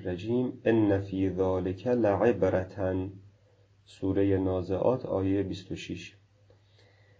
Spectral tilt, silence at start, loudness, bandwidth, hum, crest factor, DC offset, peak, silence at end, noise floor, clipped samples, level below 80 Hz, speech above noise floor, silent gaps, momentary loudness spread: -8.5 dB/octave; 0 s; -29 LUFS; 8 kHz; none; 18 dB; under 0.1%; -12 dBFS; 1.1 s; -62 dBFS; under 0.1%; -50 dBFS; 34 dB; none; 13 LU